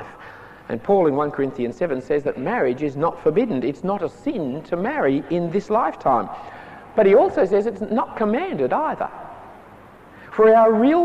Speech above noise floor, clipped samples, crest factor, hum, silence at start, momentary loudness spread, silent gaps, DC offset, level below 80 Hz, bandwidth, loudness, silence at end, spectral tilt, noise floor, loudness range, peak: 25 dB; under 0.1%; 14 dB; none; 0 s; 17 LU; none; under 0.1%; -56 dBFS; 8.2 kHz; -20 LUFS; 0 s; -8 dB/octave; -45 dBFS; 3 LU; -6 dBFS